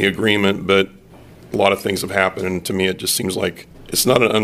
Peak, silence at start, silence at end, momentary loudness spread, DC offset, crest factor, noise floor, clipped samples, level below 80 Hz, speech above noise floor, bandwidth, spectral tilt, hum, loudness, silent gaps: 0 dBFS; 0 s; 0 s; 8 LU; under 0.1%; 18 dB; -42 dBFS; under 0.1%; -48 dBFS; 25 dB; 15.5 kHz; -3.5 dB/octave; none; -18 LUFS; none